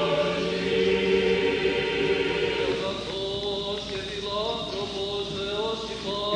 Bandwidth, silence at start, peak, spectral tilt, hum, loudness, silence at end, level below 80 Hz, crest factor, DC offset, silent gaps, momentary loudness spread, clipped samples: 10.5 kHz; 0 s; -12 dBFS; -4.5 dB/octave; none; -26 LUFS; 0 s; -48 dBFS; 14 dB; under 0.1%; none; 8 LU; under 0.1%